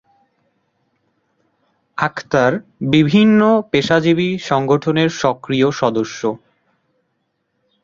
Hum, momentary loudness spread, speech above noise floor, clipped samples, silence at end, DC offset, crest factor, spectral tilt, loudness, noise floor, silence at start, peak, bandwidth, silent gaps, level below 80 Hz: none; 11 LU; 54 dB; under 0.1%; 1.45 s; under 0.1%; 16 dB; -6 dB/octave; -16 LUFS; -69 dBFS; 1.95 s; -2 dBFS; 7.4 kHz; none; -54 dBFS